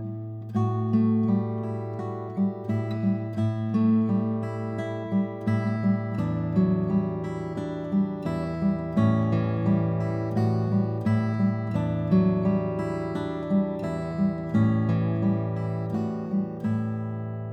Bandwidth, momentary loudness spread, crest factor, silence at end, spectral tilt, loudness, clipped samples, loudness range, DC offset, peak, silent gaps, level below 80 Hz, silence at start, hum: 6 kHz; 8 LU; 14 dB; 0 s; -10 dB/octave; -26 LUFS; under 0.1%; 2 LU; under 0.1%; -10 dBFS; none; -52 dBFS; 0 s; none